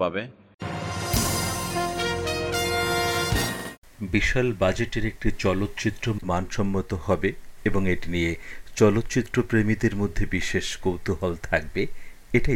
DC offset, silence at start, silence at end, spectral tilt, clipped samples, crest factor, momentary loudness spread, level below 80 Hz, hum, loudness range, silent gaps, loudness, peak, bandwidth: under 0.1%; 0 s; 0 s; -5 dB/octave; under 0.1%; 18 dB; 7 LU; -36 dBFS; none; 2 LU; 0.54-0.58 s, 3.78-3.82 s; -26 LUFS; -6 dBFS; 17.5 kHz